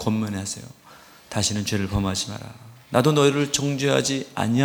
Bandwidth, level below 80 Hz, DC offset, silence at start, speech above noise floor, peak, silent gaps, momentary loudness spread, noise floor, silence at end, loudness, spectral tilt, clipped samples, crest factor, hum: 19 kHz; -46 dBFS; under 0.1%; 0 s; 21 dB; -2 dBFS; none; 13 LU; -44 dBFS; 0 s; -23 LUFS; -4.5 dB/octave; under 0.1%; 22 dB; none